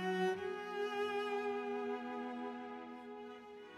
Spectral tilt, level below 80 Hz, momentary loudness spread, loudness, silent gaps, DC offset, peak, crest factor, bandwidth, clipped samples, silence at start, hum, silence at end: -5.5 dB/octave; -84 dBFS; 12 LU; -41 LUFS; none; under 0.1%; -24 dBFS; 16 dB; 14 kHz; under 0.1%; 0 s; none; 0 s